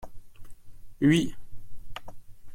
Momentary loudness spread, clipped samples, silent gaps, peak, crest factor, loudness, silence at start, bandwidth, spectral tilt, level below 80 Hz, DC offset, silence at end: 22 LU; under 0.1%; none; -10 dBFS; 18 dB; -25 LUFS; 0 s; 16.5 kHz; -6 dB/octave; -48 dBFS; under 0.1%; 0 s